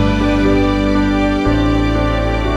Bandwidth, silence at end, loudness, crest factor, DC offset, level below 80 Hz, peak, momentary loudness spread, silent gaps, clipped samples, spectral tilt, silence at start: 9.4 kHz; 0 s; -15 LUFS; 12 dB; under 0.1%; -20 dBFS; -2 dBFS; 3 LU; none; under 0.1%; -7 dB/octave; 0 s